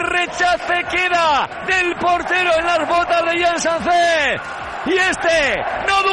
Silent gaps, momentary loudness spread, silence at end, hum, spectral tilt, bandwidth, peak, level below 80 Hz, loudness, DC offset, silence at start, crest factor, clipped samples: none; 4 LU; 0 s; none; -2.5 dB/octave; 11.5 kHz; -6 dBFS; -44 dBFS; -16 LUFS; under 0.1%; 0 s; 12 dB; under 0.1%